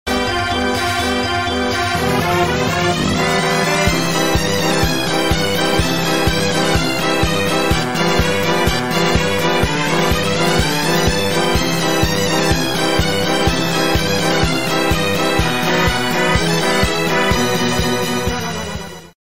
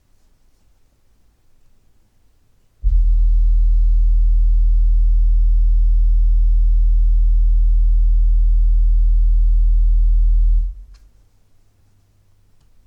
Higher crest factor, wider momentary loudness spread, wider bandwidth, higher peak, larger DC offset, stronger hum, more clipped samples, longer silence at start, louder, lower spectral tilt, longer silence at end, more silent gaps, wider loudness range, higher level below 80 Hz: first, 14 dB vs 8 dB; about the same, 2 LU vs 0 LU; first, 16.5 kHz vs 0.2 kHz; first, -2 dBFS vs -6 dBFS; first, 4% vs under 0.1%; neither; neither; second, 0.05 s vs 2.85 s; first, -16 LUFS vs -19 LUFS; second, -4 dB/octave vs -9 dB/octave; second, 0.2 s vs 2 s; neither; second, 1 LU vs 5 LU; second, -30 dBFS vs -14 dBFS